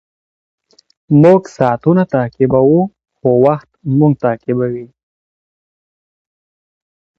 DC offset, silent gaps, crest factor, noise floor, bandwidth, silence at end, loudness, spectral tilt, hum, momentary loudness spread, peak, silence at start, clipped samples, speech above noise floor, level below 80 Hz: under 0.1%; none; 14 dB; under -90 dBFS; 7.8 kHz; 2.35 s; -13 LUFS; -10 dB/octave; none; 10 LU; 0 dBFS; 1.1 s; under 0.1%; over 78 dB; -50 dBFS